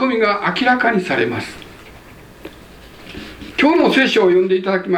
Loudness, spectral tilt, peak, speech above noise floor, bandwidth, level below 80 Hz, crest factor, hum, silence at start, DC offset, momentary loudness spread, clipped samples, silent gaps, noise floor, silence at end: -15 LUFS; -5.5 dB/octave; 0 dBFS; 25 dB; 14.5 kHz; -48 dBFS; 18 dB; none; 0 s; under 0.1%; 21 LU; under 0.1%; none; -40 dBFS; 0 s